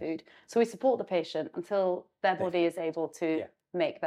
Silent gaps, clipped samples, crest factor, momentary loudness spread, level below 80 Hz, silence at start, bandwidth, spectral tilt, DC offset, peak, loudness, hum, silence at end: none; under 0.1%; 18 dB; 8 LU; -80 dBFS; 0 s; 13.5 kHz; -5.5 dB/octave; under 0.1%; -14 dBFS; -31 LUFS; none; 0 s